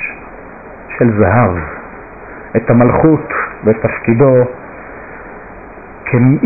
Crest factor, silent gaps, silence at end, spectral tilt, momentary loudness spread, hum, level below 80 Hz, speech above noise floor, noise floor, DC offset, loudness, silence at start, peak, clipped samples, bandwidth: 12 dB; none; 0 s; -16 dB/octave; 23 LU; none; -36 dBFS; 22 dB; -32 dBFS; under 0.1%; -12 LUFS; 0 s; -2 dBFS; under 0.1%; 2.7 kHz